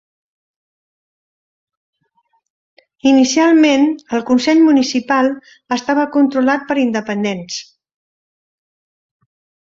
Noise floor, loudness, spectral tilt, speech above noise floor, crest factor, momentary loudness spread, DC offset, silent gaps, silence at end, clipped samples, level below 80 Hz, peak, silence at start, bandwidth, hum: -63 dBFS; -14 LUFS; -4 dB/octave; 49 dB; 16 dB; 11 LU; under 0.1%; none; 2.1 s; under 0.1%; -62 dBFS; -2 dBFS; 3.05 s; 7.8 kHz; none